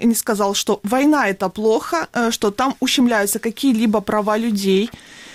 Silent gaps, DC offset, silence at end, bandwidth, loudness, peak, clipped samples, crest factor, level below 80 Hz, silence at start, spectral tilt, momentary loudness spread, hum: none; under 0.1%; 0 s; 16.5 kHz; -18 LUFS; -6 dBFS; under 0.1%; 12 dB; -54 dBFS; 0 s; -4 dB/octave; 4 LU; none